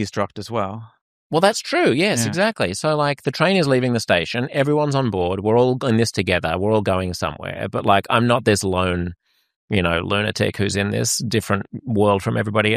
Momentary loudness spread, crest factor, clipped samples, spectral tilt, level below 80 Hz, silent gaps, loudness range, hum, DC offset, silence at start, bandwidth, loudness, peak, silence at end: 8 LU; 18 dB; under 0.1%; -5 dB/octave; -48 dBFS; 1.01-1.30 s, 9.56-9.68 s; 2 LU; none; under 0.1%; 0 s; 15.5 kHz; -20 LUFS; -2 dBFS; 0 s